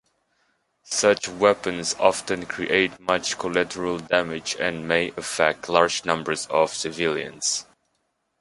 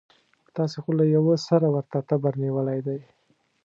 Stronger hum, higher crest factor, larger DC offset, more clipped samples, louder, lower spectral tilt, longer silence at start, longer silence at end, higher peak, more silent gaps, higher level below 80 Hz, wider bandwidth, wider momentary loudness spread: neither; about the same, 22 dB vs 18 dB; neither; neither; about the same, -23 LUFS vs -24 LUFS; second, -2.5 dB/octave vs -8.5 dB/octave; first, 0.85 s vs 0.55 s; first, 0.8 s vs 0.65 s; first, -2 dBFS vs -6 dBFS; neither; first, -58 dBFS vs -74 dBFS; first, 11.5 kHz vs 7.6 kHz; second, 7 LU vs 10 LU